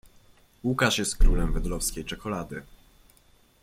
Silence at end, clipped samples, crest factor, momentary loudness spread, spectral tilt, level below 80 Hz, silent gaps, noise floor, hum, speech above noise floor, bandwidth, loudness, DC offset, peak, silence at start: 1 s; under 0.1%; 18 dB; 11 LU; -4 dB/octave; -28 dBFS; none; -60 dBFS; none; 36 dB; 15.5 kHz; -28 LUFS; under 0.1%; -8 dBFS; 0.65 s